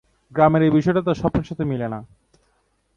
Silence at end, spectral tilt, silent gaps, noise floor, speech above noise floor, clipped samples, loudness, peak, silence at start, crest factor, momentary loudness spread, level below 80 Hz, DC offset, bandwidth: 0.9 s; -8.5 dB/octave; none; -66 dBFS; 47 dB; under 0.1%; -20 LUFS; -2 dBFS; 0.35 s; 18 dB; 14 LU; -44 dBFS; under 0.1%; 7 kHz